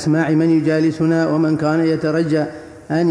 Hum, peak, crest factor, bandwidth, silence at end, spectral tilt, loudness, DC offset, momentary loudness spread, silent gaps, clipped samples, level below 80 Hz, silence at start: none; -6 dBFS; 10 dB; 10 kHz; 0 s; -7.5 dB/octave; -17 LUFS; under 0.1%; 6 LU; none; under 0.1%; -54 dBFS; 0 s